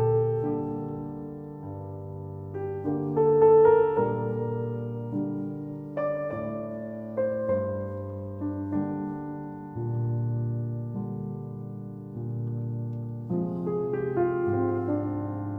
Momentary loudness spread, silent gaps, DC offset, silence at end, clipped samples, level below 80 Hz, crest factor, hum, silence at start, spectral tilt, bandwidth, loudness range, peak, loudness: 14 LU; none; under 0.1%; 0 s; under 0.1%; -60 dBFS; 18 dB; none; 0 s; -12 dB/octave; 3.3 kHz; 9 LU; -10 dBFS; -29 LUFS